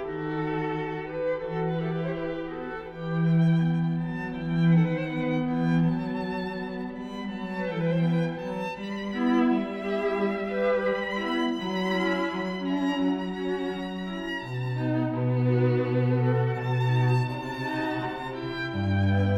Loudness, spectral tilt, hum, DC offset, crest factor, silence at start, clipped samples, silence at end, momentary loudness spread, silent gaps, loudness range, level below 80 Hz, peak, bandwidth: -27 LUFS; -8 dB/octave; none; under 0.1%; 14 dB; 0 s; under 0.1%; 0 s; 9 LU; none; 3 LU; -54 dBFS; -12 dBFS; 8 kHz